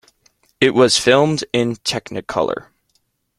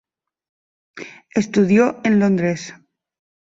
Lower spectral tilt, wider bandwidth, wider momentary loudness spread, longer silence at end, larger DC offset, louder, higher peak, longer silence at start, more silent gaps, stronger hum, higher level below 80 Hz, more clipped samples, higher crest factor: second, -4 dB/octave vs -7 dB/octave; first, 15.5 kHz vs 7.8 kHz; second, 11 LU vs 21 LU; about the same, 0.8 s vs 0.8 s; neither; about the same, -17 LUFS vs -18 LUFS; first, 0 dBFS vs -4 dBFS; second, 0.6 s vs 0.95 s; neither; neither; first, -54 dBFS vs -60 dBFS; neither; about the same, 18 dB vs 16 dB